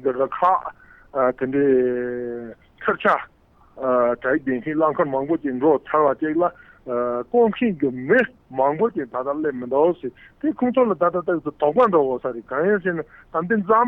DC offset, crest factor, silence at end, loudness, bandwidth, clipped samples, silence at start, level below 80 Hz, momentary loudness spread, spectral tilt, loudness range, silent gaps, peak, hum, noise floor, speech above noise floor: under 0.1%; 14 dB; 0 s; -21 LUFS; 4.1 kHz; under 0.1%; 0 s; -58 dBFS; 10 LU; -9 dB/octave; 2 LU; none; -6 dBFS; none; -42 dBFS; 21 dB